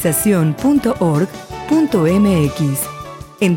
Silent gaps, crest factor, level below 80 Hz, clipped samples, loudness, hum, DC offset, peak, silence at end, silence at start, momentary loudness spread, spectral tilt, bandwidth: none; 12 dB; -40 dBFS; under 0.1%; -16 LUFS; none; under 0.1%; -4 dBFS; 0 s; 0 s; 11 LU; -6 dB/octave; 17 kHz